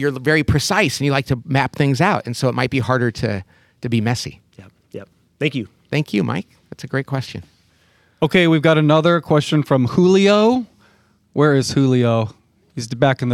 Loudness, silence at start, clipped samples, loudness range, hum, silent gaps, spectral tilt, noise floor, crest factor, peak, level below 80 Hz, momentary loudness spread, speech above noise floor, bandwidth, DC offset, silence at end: -17 LUFS; 0 s; under 0.1%; 9 LU; none; none; -6 dB/octave; -57 dBFS; 16 dB; -2 dBFS; -46 dBFS; 17 LU; 40 dB; 14.5 kHz; under 0.1%; 0 s